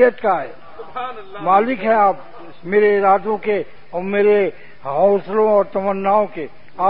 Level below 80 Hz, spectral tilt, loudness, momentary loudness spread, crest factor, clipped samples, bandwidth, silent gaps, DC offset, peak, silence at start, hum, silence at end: -58 dBFS; -11 dB/octave; -17 LUFS; 16 LU; 16 dB; under 0.1%; 5.2 kHz; none; 2%; -2 dBFS; 0 s; none; 0 s